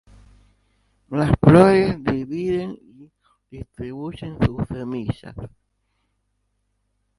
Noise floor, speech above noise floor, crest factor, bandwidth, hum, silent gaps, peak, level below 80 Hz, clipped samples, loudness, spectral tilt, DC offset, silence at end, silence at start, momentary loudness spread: -71 dBFS; 52 dB; 22 dB; 11.5 kHz; 50 Hz at -55 dBFS; none; 0 dBFS; -40 dBFS; under 0.1%; -19 LUFS; -8.5 dB/octave; under 0.1%; 1.7 s; 1.1 s; 26 LU